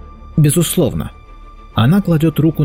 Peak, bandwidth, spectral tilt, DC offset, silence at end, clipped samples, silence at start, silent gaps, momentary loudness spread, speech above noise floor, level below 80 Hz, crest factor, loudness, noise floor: -4 dBFS; 16 kHz; -6 dB/octave; under 0.1%; 0 s; under 0.1%; 0.05 s; none; 11 LU; 23 dB; -36 dBFS; 10 dB; -15 LUFS; -36 dBFS